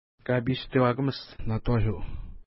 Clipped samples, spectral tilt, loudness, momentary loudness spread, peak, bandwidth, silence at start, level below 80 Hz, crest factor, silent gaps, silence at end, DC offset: under 0.1%; -11 dB/octave; -28 LUFS; 12 LU; -10 dBFS; 5.8 kHz; 0.25 s; -38 dBFS; 18 dB; none; 0.05 s; under 0.1%